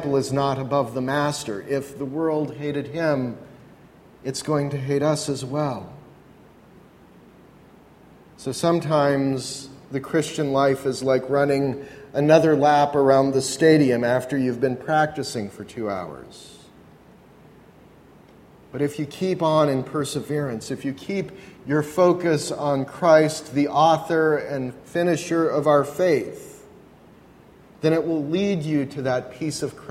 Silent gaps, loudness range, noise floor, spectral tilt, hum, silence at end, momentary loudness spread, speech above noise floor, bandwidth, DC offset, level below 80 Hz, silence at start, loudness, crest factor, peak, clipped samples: none; 10 LU; -50 dBFS; -6 dB/octave; none; 0 s; 14 LU; 28 dB; 16 kHz; under 0.1%; -60 dBFS; 0 s; -22 LUFS; 20 dB; -2 dBFS; under 0.1%